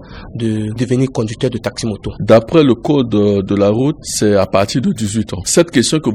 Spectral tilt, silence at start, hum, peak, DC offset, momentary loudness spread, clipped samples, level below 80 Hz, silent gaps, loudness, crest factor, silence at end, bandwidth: -5.5 dB/octave; 0 s; none; 0 dBFS; under 0.1%; 9 LU; under 0.1%; -40 dBFS; none; -14 LUFS; 14 dB; 0 s; 15 kHz